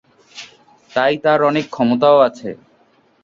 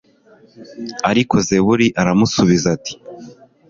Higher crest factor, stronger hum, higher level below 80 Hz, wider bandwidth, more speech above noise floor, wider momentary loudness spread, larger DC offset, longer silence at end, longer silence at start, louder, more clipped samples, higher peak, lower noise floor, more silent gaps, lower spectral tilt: about the same, 16 dB vs 16 dB; neither; second, -62 dBFS vs -46 dBFS; about the same, 7.6 kHz vs 7.6 kHz; first, 41 dB vs 24 dB; first, 23 LU vs 17 LU; neither; first, 0.7 s vs 0.35 s; second, 0.35 s vs 0.6 s; about the same, -15 LUFS vs -15 LUFS; neither; about the same, -2 dBFS vs 0 dBFS; first, -56 dBFS vs -40 dBFS; neither; about the same, -6 dB/octave vs -5 dB/octave